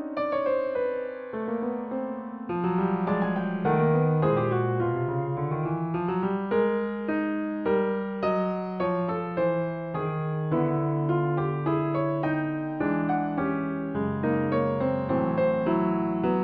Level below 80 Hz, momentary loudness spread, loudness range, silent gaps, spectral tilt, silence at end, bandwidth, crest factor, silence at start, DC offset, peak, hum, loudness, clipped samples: -60 dBFS; 6 LU; 2 LU; none; -8 dB/octave; 0 s; 4.9 kHz; 14 dB; 0 s; under 0.1%; -12 dBFS; none; -27 LUFS; under 0.1%